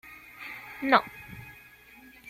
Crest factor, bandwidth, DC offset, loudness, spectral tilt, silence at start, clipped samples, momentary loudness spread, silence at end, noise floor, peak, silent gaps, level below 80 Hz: 26 dB; 16.5 kHz; under 0.1%; -26 LUFS; -5 dB/octave; 0.4 s; under 0.1%; 23 LU; 0.8 s; -53 dBFS; -6 dBFS; none; -62 dBFS